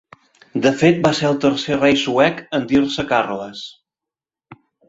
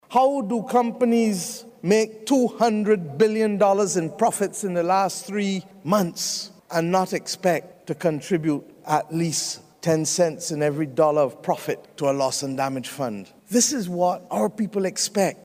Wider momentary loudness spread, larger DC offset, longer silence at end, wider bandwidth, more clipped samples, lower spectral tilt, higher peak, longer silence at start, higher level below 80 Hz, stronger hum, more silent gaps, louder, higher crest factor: first, 13 LU vs 8 LU; neither; first, 0.35 s vs 0.1 s; second, 8 kHz vs 16 kHz; neither; about the same, -5.5 dB/octave vs -4.5 dB/octave; first, 0 dBFS vs -8 dBFS; first, 0.55 s vs 0.1 s; first, -52 dBFS vs -68 dBFS; neither; neither; first, -17 LUFS vs -23 LUFS; about the same, 18 dB vs 16 dB